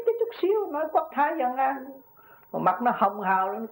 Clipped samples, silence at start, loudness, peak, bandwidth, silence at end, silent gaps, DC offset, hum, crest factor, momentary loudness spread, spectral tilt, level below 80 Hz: under 0.1%; 0 s; -26 LUFS; -10 dBFS; 16.5 kHz; 0 s; none; under 0.1%; none; 16 dB; 4 LU; -8.5 dB/octave; -76 dBFS